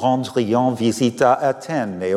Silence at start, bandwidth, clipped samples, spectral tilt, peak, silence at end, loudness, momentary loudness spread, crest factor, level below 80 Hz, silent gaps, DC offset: 0 s; 14 kHz; under 0.1%; -6 dB/octave; -4 dBFS; 0 s; -19 LUFS; 7 LU; 16 dB; -64 dBFS; none; under 0.1%